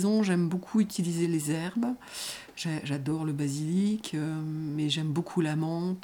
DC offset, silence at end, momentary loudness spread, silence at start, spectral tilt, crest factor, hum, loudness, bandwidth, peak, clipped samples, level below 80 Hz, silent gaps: under 0.1%; 0 s; 6 LU; 0 s; -6 dB/octave; 16 dB; none; -30 LUFS; 18.5 kHz; -14 dBFS; under 0.1%; -68 dBFS; none